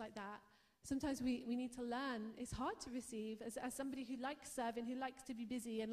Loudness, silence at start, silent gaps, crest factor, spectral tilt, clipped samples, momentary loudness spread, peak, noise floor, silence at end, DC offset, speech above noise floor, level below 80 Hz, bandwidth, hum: -46 LUFS; 0 s; none; 14 dB; -4 dB/octave; under 0.1%; 7 LU; -32 dBFS; -67 dBFS; 0 s; under 0.1%; 22 dB; -68 dBFS; 15 kHz; none